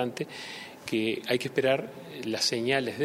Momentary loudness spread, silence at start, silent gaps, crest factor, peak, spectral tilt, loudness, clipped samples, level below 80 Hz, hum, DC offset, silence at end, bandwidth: 13 LU; 0 s; none; 18 dB; -12 dBFS; -4 dB/octave; -29 LUFS; under 0.1%; -72 dBFS; none; under 0.1%; 0 s; 16 kHz